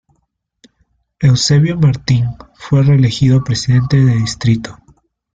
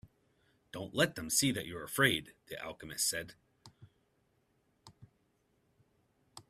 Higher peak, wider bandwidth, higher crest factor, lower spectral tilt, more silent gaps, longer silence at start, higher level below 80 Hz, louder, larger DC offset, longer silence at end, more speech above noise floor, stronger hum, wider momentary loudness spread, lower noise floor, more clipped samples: first, -2 dBFS vs -12 dBFS; second, 9 kHz vs 15.5 kHz; second, 12 dB vs 26 dB; first, -6 dB/octave vs -2.5 dB/octave; neither; first, 1.2 s vs 0.05 s; first, -40 dBFS vs -68 dBFS; first, -13 LUFS vs -33 LUFS; neither; first, 0.65 s vs 0.1 s; first, 54 dB vs 41 dB; neither; second, 6 LU vs 17 LU; second, -65 dBFS vs -76 dBFS; neither